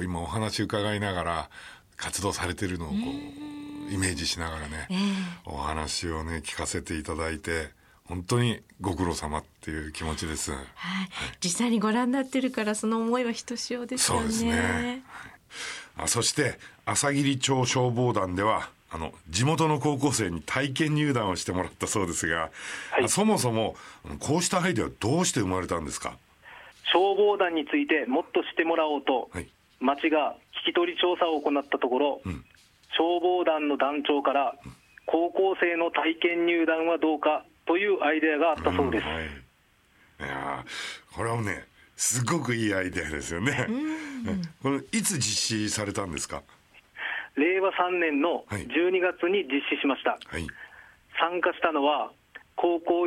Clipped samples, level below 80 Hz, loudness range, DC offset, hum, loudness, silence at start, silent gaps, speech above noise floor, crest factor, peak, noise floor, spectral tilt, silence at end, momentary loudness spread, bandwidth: under 0.1%; -52 dBFS; 5 LU; under 0.1%; none; -27 LUFS; 0 s; none; 36 dB; 22 dB; -6 dBFS; -63 dBFS; -4 dB/octave; 0 s; 12 LU; 16 kHz